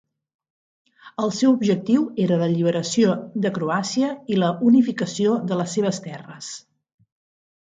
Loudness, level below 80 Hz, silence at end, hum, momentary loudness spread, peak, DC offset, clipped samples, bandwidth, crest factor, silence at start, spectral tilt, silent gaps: -21 LUFS; -68 dBFS; 1.05 s; none; 17 LU; -6 dBFS; under 0.1%; under 0.1%; 9.4 kHz; 16 dB; 1.05 s; -6 dB/octave; none